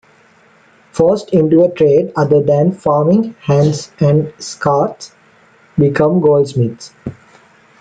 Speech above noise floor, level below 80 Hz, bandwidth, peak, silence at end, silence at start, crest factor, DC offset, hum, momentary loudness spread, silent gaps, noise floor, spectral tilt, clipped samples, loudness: 36 dB; -50 dBFS; 9.2 kHz; 0 dBFS; 0.7 s; 0.95 s; 14 dB; under 0.1%; none; 15 LU; none; -49 dBFS; -7.5 dB/octave; under 0.1%; -13 LUFS